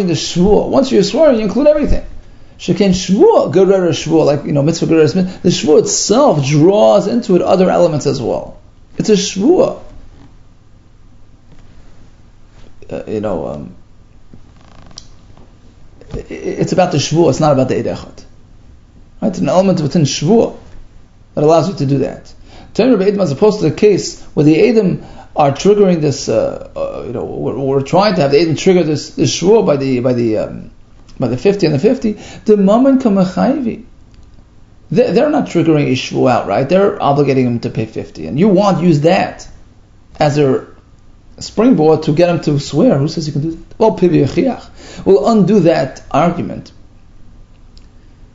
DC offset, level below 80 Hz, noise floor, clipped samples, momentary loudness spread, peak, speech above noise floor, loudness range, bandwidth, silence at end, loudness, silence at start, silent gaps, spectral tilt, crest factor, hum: under 0.1%; -36 dBFS; -42 dBFS; under 0.1%; 12 LU; 0 dBFS; 30 dB; 8 LU; 8 kHz; 0.1 s; -13 LUFS; 0 s; none; -6 dB/octave; 14 dB; none